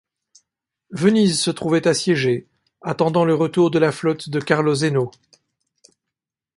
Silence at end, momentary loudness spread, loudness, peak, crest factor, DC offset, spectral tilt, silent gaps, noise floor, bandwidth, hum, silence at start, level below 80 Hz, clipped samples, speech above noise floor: 1.45 s; 9 LU; -19 LUFS; -2 dBFS; 18 dB; under 0.1%; -5.5 dB/octave; none; -85 dBFS; 11.5 kHz; none; 0.9 s; -60 dBFS; under 0.1%; 67 dB